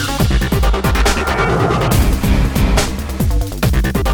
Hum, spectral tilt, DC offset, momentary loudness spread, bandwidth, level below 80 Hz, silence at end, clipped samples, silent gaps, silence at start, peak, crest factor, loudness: none; -5 dB/octave; under 0.1%; 4 LU; 20 kHz; -16 dBFS; 0 s; under 0.1%; none; 0 s; -2 dBFS; 12 dB; -15 LUFS